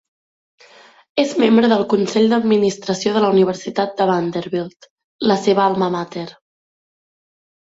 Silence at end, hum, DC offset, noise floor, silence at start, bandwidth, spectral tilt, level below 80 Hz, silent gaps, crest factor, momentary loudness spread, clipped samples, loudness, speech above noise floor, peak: 1.3 s; none; under 0.1%; -47 dBFS; 1.15 s; 8 kHz; -5.5 dB/octave; -62 dBFS; 4.90-4.97 s, 5.04-5.19 s; 16 dB; 11 LU; under 0.1%; -17 LUFS; 31 dB; -2 dBFS